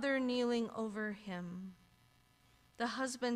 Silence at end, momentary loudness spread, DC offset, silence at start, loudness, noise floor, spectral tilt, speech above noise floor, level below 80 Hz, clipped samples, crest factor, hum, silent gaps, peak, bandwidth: 0 s; 12 LU; under 0.1%; 0 s; -39 LUFS; -69 dBFS; -4.5 dB/octave; 31 dB; -74 dBFS; under 0.1%; 14 dB; none; none; -24 dBFS; 13.5 kHz